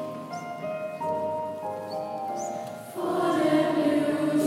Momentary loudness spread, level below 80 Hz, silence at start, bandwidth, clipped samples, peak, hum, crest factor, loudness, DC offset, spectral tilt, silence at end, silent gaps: 12 LU; -76 dBFS; 0 s; 16 kHz; under 0.1%; -12 dBFS; none; 16 dB; -28 LUFS; under 0.1%; -5.5 dB/octave; 0 s; none